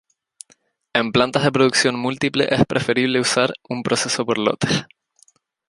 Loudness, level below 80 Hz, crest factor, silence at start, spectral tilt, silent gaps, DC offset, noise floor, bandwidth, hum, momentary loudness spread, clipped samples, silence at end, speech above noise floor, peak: -19 LUFS; -54 dBFS; 20 dB; 0.95 s; -4 dB/octave; none; under 0.1%; -59 dBFS; 11.5 kHz; none; 6 LU; under 0.1%; 0.85 s; 40 dB; -2 dBFS